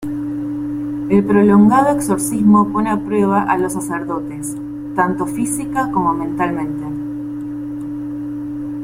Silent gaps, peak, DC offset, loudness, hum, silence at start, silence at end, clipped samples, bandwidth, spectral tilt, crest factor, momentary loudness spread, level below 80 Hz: none; -2 dBFS; under 0.1%; -17 LUFS; none; 0 s; 0 s; under 0.1%; 15.5 kHz; -6.5 dB/octave; 16 dB; 14 LU; -48 dBFS